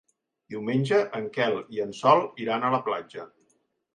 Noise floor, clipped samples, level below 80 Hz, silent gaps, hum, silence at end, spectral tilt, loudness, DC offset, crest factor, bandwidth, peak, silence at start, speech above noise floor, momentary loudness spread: -71 dBFS; under 0.1%; -74 dBFS; none; none; 0.7 s; -6.5 dB/octave; -26 LUFS; under 0.1%; 20 dB; 10 kHz; -6 dBFS; 0.5 s; 45 dB; 14 LU